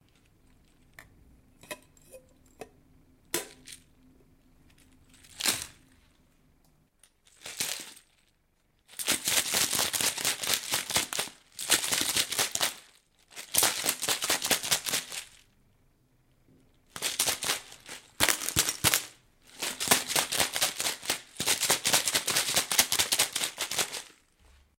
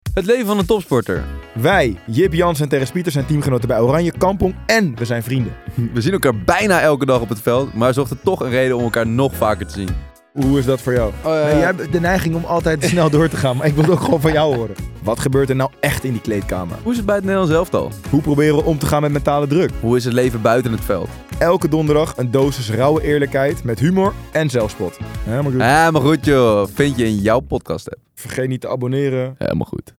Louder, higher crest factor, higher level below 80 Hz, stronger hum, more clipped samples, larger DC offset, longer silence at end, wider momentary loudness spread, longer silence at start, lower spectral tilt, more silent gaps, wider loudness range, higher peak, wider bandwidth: second, -27 LUFS vs -17 LUFS; first, 32 dB vs 16 dB; second, -60 dBFS vs -34 dBFS; neither; neither; neither; first, 0.7 s vs 0.2 s; first, 20 LU vs 8 LU; first, 1 s vs 0.05 s; second, 0 dB/octave vs -6.5 dB/octave; neither; first, 15 LU vs 2 LU; about the same, 0 dBFS vs 0 dBFS; about the same, 17 kHz vs 17 kHz